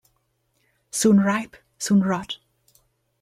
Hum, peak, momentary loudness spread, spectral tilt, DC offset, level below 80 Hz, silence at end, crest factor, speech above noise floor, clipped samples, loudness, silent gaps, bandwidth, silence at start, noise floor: none; -6 dBFS; 17 LU; -5 dB/octave; under 0.1%; -64 dBFS; 0.85 s; 18 dB; 50 dB; under 0.1%; -21 LUFS; none; 14.5 kHz; 0.95 s; -70 dBFS